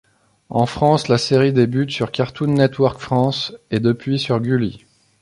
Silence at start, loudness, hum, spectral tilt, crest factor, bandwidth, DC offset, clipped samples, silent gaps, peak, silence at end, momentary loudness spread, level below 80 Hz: 0.5 s; -18 LUFS; none; -6.5 dB/octave; 16 dB; 11.5 kHz; under 0.1%; under 0.1%; none; -2 dBFS; 0.45 s; 7 LU; -50 dBFS